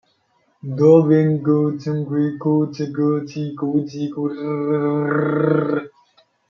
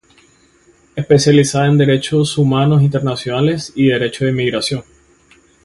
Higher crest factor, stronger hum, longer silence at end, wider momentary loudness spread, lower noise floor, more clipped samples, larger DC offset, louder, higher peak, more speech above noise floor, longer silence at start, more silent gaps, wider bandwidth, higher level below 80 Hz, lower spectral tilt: about the same, 18 dB vs 14 dB; neither; second, 0.6 s vs 0.8 s; first, 12 LU vs 8 LU; first, -63 dBFS vs -51 dBFS; neither; neither; second, -19 LUFS vs -14 LUFS; about the same, -2 dBFS vs 0 dBFS; first, 45 dB vs 38 dB; second, 0.65 s vs 0.95 s; neither; second, 6.8 kHz vs 11.5 kHz; second, -66 dBFS vs -48 dBFS; first, -9.5 dB/octave vs -6 dB/octave